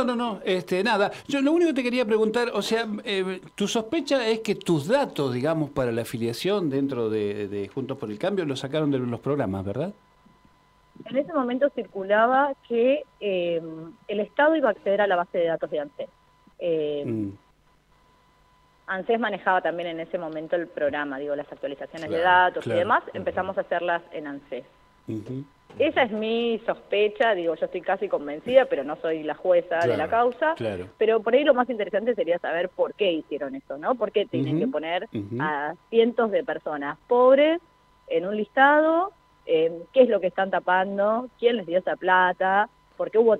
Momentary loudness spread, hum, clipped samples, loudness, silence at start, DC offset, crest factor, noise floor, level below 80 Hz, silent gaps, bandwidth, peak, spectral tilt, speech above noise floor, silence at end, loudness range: 12 LU; none; under 0.1%; -24 LUFS; 0 s; under 0.1%; 20 dB; -61 dBFS; -64 dBFS; none; 15 kHz; -4 dBFS; -5.5 dB/octave; 37 dB; 0 s; 6 LU